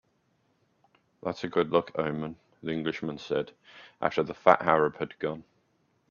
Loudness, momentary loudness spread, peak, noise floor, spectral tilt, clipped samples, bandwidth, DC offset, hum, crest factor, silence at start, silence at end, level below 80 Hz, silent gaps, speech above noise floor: -29 LUFS; 15 LU; -2 dBFS; -71 dBFS; -6.5 dB/octave; under 0.1%; 7.2 kHz; under 0.1%; none; 28 dB; 1.25 s; 0.7 s; -68 dBFS; none; 43 dB